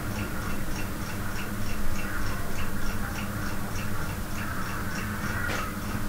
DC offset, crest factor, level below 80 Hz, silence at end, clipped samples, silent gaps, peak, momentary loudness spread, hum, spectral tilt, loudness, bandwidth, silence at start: under 0.1%; 14 dB; -34 dBFS; 0 s; under 0.1%; none; -14 dBFS; 3 LU; none; -4.5 dB/octave; -33 LUFS; 16 kHz; 0 s